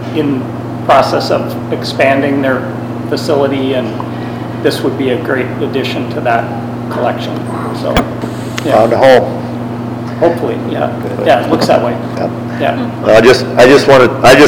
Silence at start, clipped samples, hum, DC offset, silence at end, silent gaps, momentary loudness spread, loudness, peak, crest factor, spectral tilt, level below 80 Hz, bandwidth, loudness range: 0 s; 1%; none; under 0.1%; 0 s; none; 13 LU; -12 LUFS; 0 dBFS; 12 dB; -5.5 dB/octave; -38 dBFS; over 20 kHz; 6 LU